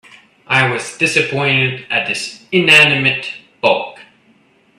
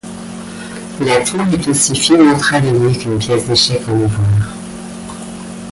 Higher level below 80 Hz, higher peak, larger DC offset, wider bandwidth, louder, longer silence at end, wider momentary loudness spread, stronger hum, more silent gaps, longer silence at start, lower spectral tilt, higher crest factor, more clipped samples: second, -58 dBFS vs -38 dBFS; about the same, 0 dBFS vs 0 dBFS; neither; first, 14.5 kHz vs 11.5 kHz; about the same, -13 LUFS vs -13 LUFS; first, 0.75 s vs 0 s; second, 13 LU vs 18 LU; neither; neither; first, 0.5 s vs 0.05 s; about the same, -3.5 dB/octave vs -4.5 dB/octave; about the same, 16 dB vs 14 dB; neither